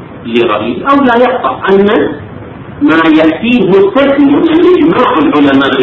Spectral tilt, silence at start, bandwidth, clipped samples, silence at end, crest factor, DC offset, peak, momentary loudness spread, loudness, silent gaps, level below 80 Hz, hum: -7.5 dB/octave; 0 s; 6.4 kHz; 1%; 0 s; 8 dB; under 0.1%; 0 dBFS; 8 LU; -8 LUFS; none; -40 dBFS; none